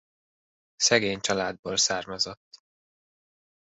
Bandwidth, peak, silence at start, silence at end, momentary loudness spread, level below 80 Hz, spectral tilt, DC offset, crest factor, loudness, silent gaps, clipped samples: 8.4 kHz; -6 dBFS; 0.8 s; 1.15 s; 8 LU; -64 dBFS; -1.5 dB/octave; under 0.1%; 24 dB; -25 LUFS; 1.59-1.63 s, 2.37-2.51 s; under 0.1%